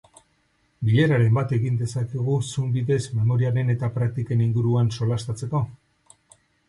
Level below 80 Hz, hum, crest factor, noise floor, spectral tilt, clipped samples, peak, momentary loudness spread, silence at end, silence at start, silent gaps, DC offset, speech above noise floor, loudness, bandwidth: -54 dBFS; none; 14 dB; -66 dBFS; -7.5 dB/octave; under 0.1%; -8 dBFS; 7 LU; 0.95 s; 0.8 s; none; under 0.1%; 44 dB; -23 LUFS; 11.5 kHz